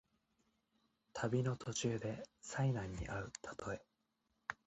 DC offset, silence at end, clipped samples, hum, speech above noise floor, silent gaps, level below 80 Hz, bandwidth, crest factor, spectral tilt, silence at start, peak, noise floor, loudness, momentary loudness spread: under 0.1%; 0.1 s; under 0.1%; none; 43 dB; none; -62 dBFS; 8.8 kHz; 22 dB; -5.5 dB/octave; 1.15 s; -20 dBFS; -84 dBFS; -42 LUFS; 11 LU